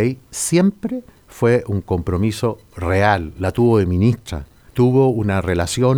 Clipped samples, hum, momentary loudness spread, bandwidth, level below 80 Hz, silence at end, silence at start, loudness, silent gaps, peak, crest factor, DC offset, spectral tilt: under 0.1%; none; 12 LU; over 20 kHz; -38 dBFS; 0 s; 0 s; -18 LUFS; none; -2 dBFS; 16 dB; under 0.1%; -6 dB/octave